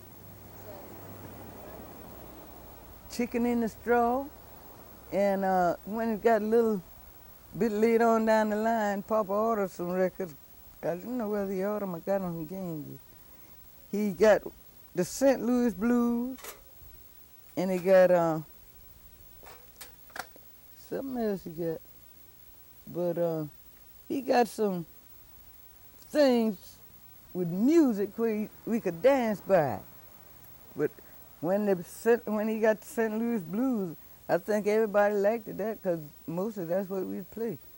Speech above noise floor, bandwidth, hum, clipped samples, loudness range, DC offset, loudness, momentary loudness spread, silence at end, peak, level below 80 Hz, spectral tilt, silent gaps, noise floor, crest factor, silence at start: 25 dB; 17.5 kHz; none; under 0.1%; 8 LU; under 0.1%; -29 LUFS; 24 LU; 0 s; -12 dBFS; -60 dBFS; -6.5 dB/octave; none; -53 dBFS; 18 dB; 0 s